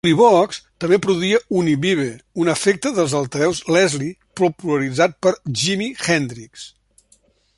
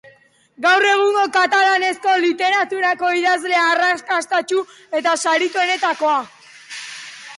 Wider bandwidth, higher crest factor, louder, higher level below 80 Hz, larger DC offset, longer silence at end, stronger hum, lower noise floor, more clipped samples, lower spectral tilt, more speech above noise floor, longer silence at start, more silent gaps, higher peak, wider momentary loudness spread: about the same, 11.5 kHz vs 11.5 kHz; first, 18 dB vs 12 dB; about the same, -18 LUFS vs -17 LUFS; first, -56 dBFS vs -72 dBFS; neither; first, 0.9 s vs 0 s; neither; first, -58 dBFS vs -51 dBFS; neither; first, -4.5 dB/octave vs -0.5 dB/octave; first, 40 dB vs 34 dB; second, 0.05 s vs 0.6 s; neither; first, -2 dBFS vs -6 dBFS; second, 10 LU vs 13 LU